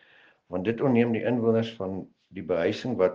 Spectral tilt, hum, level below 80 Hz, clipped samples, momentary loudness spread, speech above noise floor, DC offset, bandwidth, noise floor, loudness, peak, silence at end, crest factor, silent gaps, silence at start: -8 dB/octave; none; -66 dBFS; under 0.1%; 14 LU; 33 dB; under 0.1%; 7.2 kHz; -59 dBFS; -27 LUFS; -8 dBFS; 0 s; 18 dB; none; 0.5 s